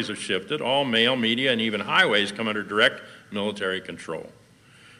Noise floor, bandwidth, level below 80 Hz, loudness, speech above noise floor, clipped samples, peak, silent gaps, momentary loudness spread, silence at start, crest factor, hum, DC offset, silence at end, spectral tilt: -53 dBFS; 14.5 kHz; -70 dBFS; -23 LUFS; 28 dB; under 0.1%; -6 dBFS; none; 15 LU; 0 s; 20 dB; none; under 0.1%; 0.7 s; -3.5 dB/octave